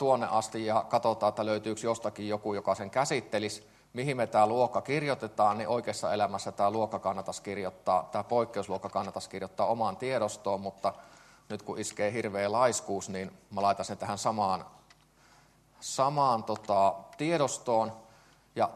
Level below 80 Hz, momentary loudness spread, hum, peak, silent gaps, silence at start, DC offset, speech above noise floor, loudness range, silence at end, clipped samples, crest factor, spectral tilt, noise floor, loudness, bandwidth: -72 dBFS; 10 LU; none; -10 dBFS; none; 0 s; under 0.1%; 31 dB; 3 LU; 0 s; under 0.1%; 20 dB; -4.5 dB/octave; -62 dBFS; -31 LUFS; 13 kHz